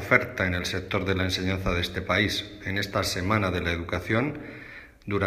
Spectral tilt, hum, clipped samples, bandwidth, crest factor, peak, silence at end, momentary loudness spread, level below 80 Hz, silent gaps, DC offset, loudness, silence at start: -5 dB/octave; none; under 0.1%; 15.5 kHz; 22 dB; -4 dBFS; 0 s; 9 LU; -46 dBFS; none; under 0.1%; -27 LUFS; 0 s